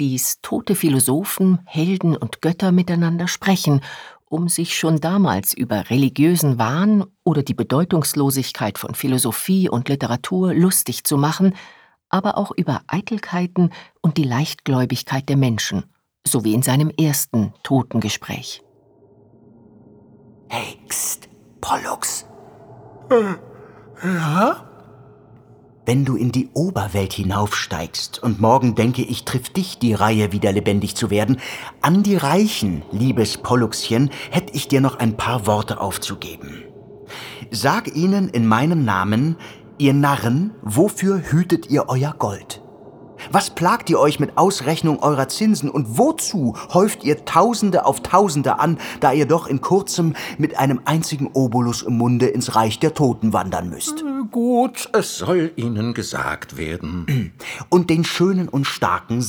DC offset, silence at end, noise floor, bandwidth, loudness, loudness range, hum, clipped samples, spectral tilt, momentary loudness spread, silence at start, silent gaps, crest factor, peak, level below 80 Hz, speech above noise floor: under 0.1%; 0 s; -52 dBFS; over 20 kHz; -19 LUFS; 5 LU; none; under 0.1%; -5.5 dB/octave; 9 LU; 0 s; none; 18 dB; 0 dBFS; -52 dBFS; 34 dB